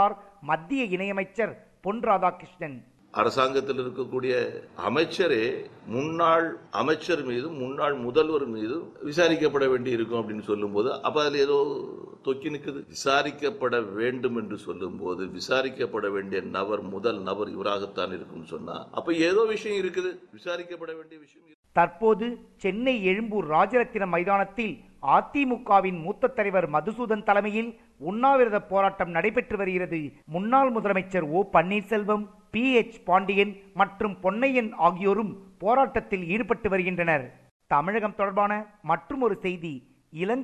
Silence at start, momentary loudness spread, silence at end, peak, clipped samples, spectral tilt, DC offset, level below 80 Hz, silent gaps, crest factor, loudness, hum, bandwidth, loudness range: 0 s; 12 LU; 0 s; -6 dBFS; under 0.1%; -5.5 dB/octave; under 0.1%; -60 dBFS; 21.54-21.63 s, 37.51-37.60 s; 20 dB; -26 LUFS; none; 11.5 kHz; 4 LU